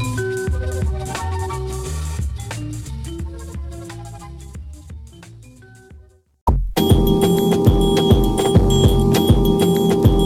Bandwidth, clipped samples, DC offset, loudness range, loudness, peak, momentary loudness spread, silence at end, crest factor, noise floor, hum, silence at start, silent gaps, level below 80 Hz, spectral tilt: 16.5 kHz; under 0.1%; under 0.1%; 18 LU; -18 LUFS; 0 dBFS; 20 LU; 0 s; 18 dB; -46 dBFS; none; 0 s; 6.41-6.47 s; -24 dBFS; -6.5 dB/octave